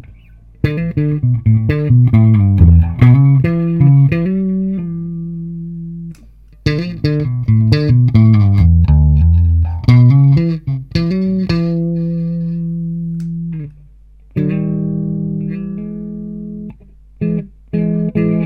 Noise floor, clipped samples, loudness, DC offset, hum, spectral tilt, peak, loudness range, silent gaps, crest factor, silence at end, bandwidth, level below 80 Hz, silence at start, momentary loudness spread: -42 dBFS; under 0.1%; -14 LUFS; under 0.1%; none; -10 dB/octave; 0 dBFS; 11 LU; none; 12 dB; 0 s; 5.8 kHz; -24 dBFS; 0.05 s; 16 LU